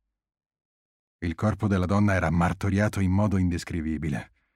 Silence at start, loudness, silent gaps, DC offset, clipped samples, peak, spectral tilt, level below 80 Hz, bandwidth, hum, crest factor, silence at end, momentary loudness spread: 1.2 s; -26 LUFS; none; under 0.1%; under 0.1%; -10 dBFS; -7.5 dB/octave; -44 dBFS; 12.5 kHz; none; 16 dB; 0.3 s; 9 LU